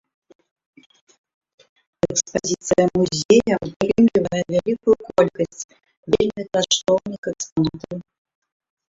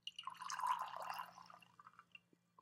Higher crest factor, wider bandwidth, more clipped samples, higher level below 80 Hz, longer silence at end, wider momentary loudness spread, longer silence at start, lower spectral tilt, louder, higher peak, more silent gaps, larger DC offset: about the same, 20 dB vs 20 dB; second, 7.8 kHz vs 16 kHz; neither; first, -52 dBFS vs under -90 dBFS; first, 0.9 s vs 0.45 s; second, 13 LU vs 22 LU; first, 2.05 s vs 0.05 s; first, -4.5 dB/octave vs 0 dB/octave; first, -20 LUFS vs -46 LUFS; first, -2 dBFS vs -28 dBFS; first, 3.25-3.29 s, 3.76-3.80 s, 5.64-5.69 s, 5.97-6.03 s, 7.18-7.23 s, 7.52-7.56 s vs none; neither